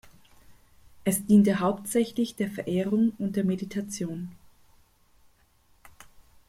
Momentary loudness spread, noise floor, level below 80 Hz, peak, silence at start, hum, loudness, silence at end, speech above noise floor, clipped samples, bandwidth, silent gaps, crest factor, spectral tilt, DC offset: 13 LU; -63 dBFS; -62 dBFS; -10 dBFS; 0.5 s; none; -26 LUFS; 0.6 s; 37 dB; under 0.1%; 16 kHz; none; 18 dB; -6 dB/octave; under 0.1%